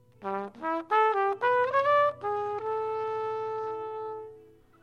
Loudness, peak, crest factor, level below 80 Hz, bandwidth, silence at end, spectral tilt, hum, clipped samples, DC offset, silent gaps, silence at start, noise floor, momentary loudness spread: -28 LUFS; -12 dBFS; 16 dB; -76 dBFS; 9.2 kHz; 0.4 s; -5.5 dB/octave; none; under 0.1%; under 0.1%; none; 0.2 s; -55 dBFS; 12 LU